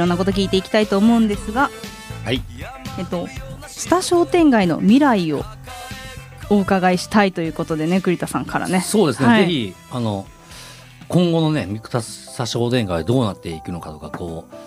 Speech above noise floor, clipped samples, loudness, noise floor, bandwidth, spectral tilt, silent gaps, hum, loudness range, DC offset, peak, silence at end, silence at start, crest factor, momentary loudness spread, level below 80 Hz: 22 dB; under 0.1%; -18 LUFS; -40 dBFS; 15.5 kHz; -5.5 dB/octave; none; none; 5 LU; under 0.1%; -2 dBFS; 0 s; 0 s; 18 dB; 18 LU; -42 dBFS